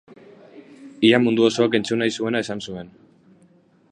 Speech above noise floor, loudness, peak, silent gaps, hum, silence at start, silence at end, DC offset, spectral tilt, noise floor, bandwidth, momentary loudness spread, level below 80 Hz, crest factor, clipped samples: 36 dB; -20 LUFS; -2 dBFS; none; none; 0.55 s; 1.05 s; under 0.1%; -5 dB/octave; -56 dBFS; 9.6 kHz; 14 LU; -64 dBFS; 22 dB; under 0.1%